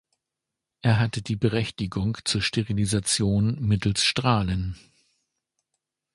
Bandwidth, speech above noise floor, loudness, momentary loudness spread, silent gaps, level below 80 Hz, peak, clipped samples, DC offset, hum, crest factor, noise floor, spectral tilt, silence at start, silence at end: 11.5 kHz; 62 dB; -24 LUFS; 7 LU; none; -44 dBFS; -6 dBFS; under 0.1%; under 0.1%; none; 20 dB; -86 dBFS; -4.5 dB/octave; 0.85 s; 1.4 s